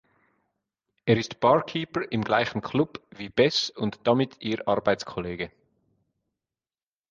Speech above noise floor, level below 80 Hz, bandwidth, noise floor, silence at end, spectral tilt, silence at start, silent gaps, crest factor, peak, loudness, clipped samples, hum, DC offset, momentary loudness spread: over 65 dB; -58 dBFS; 7.6 kHz; under -90 dBFS; 1.6 s; -5.5 dB/octave; 1.05 s; none; 20 dB; -6 dBFS; -26 LUFS; under 0.1%; none; under 0.1%; 11 LU